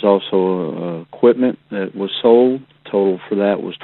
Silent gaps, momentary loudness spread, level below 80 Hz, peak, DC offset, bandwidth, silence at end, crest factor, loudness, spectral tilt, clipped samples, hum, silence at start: none; 12 LU; -64 dBFS; 0 dBFS; under 0.1%; 4.2 kHz; 0 s; 16 dB; -17 LUFS; -11 dB/octave; under 0.1%; none; 0 s